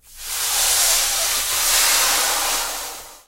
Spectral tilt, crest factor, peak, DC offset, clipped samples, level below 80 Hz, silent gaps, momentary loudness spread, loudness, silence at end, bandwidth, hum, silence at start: 2.5 dB/octave; 16 dB; -4 dBFS; under 0.1%; under 0.1%; -42 dBFS; none; 11 LU; -16 LUFS; 0.1 s; 16 kHz; none; 0.1 s